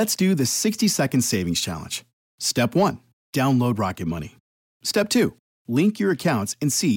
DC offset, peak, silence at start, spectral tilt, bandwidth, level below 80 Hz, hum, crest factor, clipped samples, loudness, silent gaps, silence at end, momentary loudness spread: under 0.1%; -10 dBFS; 0 s; -4.5 dB/octave; 17 kHz; -58 dBFS; none; 12 dB; under 0.1%; -22 LUFS; 2.13-2.38 s, 3.13-3.33 s, 4.40-4.80 s, 5.39-5.65 s; 0 s; 10 LU